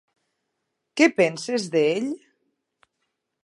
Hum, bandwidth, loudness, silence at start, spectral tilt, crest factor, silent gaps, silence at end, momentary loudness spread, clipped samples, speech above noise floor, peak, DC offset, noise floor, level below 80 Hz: none; 11.5 kHz; -22 LUFS; 0.95 s; -4.5 dB/octave; 22 dB; none; 1.25 s; 15 LU; under 0.1%; 57 dB; -4 dBFS; under 0.1%; -79 dBFS; -74 dBFS